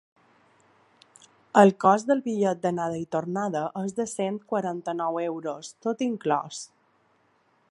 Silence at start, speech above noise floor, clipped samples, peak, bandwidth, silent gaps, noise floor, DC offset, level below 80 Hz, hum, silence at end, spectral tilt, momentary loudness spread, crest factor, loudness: 1.55 s; 41 dB; under 0.1%; -2 dBFS; 11.5 kHz; none; -66 dBFS; under 0.1%; -72 dBFS; none; 1.05 s; -6 dB/octave; 13 LU; 24 dB; -26 LUFS